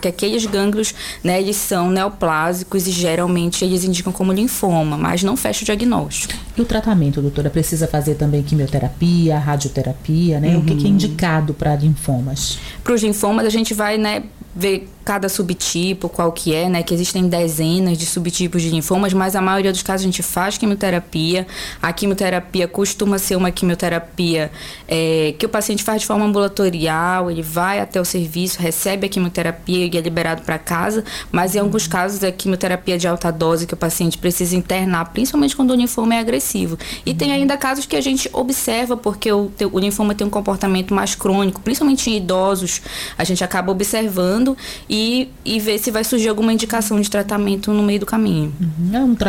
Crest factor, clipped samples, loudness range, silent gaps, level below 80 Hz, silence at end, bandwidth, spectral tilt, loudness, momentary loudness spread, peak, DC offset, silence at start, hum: 12 dB; under 0.1%; 2 LU; none; -38 dBFS; 0 s; 17 kHz; -5 dB/octave; -18 LUFS; 4 LU; -6 dBFS; under 0.1%; 0 s; none